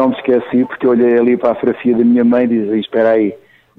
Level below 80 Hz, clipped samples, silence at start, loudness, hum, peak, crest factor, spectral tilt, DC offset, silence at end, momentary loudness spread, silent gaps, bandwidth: -56 dBFS; under 0.1%; 0 s; -13 LUFS; none; -2 dBFS; 10 dB; -9 dB/octave; under 0.1%; 0.45 s; 5 LU; none; 4 kHz